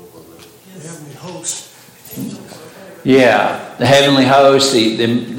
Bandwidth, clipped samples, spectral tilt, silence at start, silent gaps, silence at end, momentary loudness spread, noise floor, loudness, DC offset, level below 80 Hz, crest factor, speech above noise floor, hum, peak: 17 kHz; under 0.1%; -4 dB/octave; 0.75 s; none; 0 s; 23 LU; -40 dBFS; -12 LUFS; under 0.1%; -56 dBFS; 14 dB; 27 dB; none; 0 dBFS